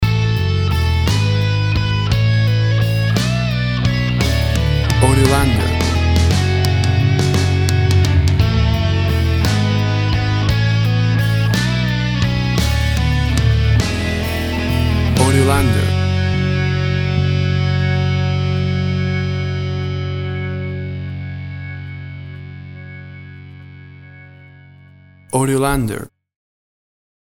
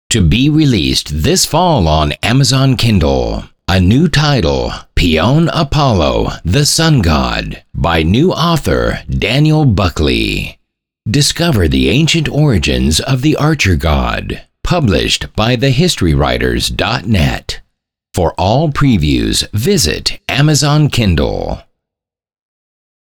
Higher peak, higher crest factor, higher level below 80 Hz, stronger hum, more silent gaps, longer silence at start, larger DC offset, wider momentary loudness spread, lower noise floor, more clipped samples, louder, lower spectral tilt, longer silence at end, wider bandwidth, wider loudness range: about the same, 0 dBFS vs 0 dBFS; about the same, 16 dB vs 12 dB; about the same, -26 dBFS vs -24 dBFS; neither; neither; about the same, 0 s vs 0.1 s; neither; first, 13 LU vs 7 LU; second, -44 dBFS vs -83 dBFS; neither; second, -16 LUFS vs -12 LUFS; about the same, -6 dB/octave vs -5 dB/octave; second, 1.25 s vs 1.45 s; about the same, 19.5 kHz vs 20 kHz; first, 12 LU vs 2 LU